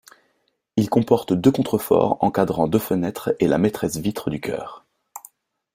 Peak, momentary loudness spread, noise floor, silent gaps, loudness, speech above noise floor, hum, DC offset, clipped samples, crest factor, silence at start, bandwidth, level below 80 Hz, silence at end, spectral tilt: -2 dBFS; 15 LU; -69 dBFS; none; -21 LUFS; 49 dB; none; under 0.1%; under 0.1%; 20 dB; 0.75 s; 16 kHz; -54 dBFS; 0.55 s; -6.5 dB/octave